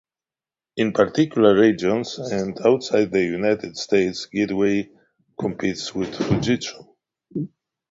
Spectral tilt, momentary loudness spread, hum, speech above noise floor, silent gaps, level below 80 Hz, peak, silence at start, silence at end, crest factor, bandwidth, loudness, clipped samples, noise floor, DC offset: -5.5 dB/octave; 14 LU; none; over 70 dB; none; -54 dBFS; -2 dBFS; 0.75 s; 0.45 s; 20 dB; 7.8 kHz; -21 LUFS; under 0.1%; under -90 dBFS; under 0.1%